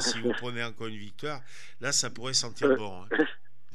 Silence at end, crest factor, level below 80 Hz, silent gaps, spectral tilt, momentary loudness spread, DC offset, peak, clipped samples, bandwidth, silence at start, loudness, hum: 0.4 s; 20 dB; -78 dBFS; none; -2.5 dB/octave; 13 LU; 2%; -12 dBFS; under 0.1%; 14.5 kHz; 0 s; -30 LUFS; none